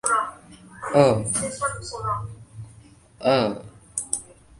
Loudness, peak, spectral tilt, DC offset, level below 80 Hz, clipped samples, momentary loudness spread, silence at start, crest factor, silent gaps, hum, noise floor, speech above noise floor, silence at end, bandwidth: -24 LUFS; -2 dBFS; -4.5 dB/octave; under 0.1%; -52 dBFS; under 0.1%; 21 LU; 0.05 s; 24 dB; none; none; -50 dBFS; 28 dB; 0.35 s; 11.5 kHz